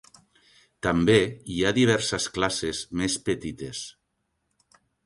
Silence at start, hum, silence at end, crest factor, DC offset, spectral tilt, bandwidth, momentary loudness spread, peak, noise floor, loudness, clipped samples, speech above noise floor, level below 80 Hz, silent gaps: 0.85 s; none; 1.15 s; 20 dB; under 0.1%; -4.5 dB/octave; 11.5 kHz; 14 LU; -6 dBFS; -76 dBFS; -25 LUFS; under 0.1%; 52 dB; -50 dBFS; none